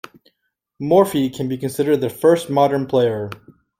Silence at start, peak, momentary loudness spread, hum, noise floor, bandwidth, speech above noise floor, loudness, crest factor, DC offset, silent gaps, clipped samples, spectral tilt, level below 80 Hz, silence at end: 0.8 s; -2 dBFS; 13 LU; none; -73 dBFS; 16 kHz; 55 dB; -18 LUFS; 18 dB; under 0.1%; none; under 0.1%; -6.5 dB/octave; -58 dBFS; 0.45 s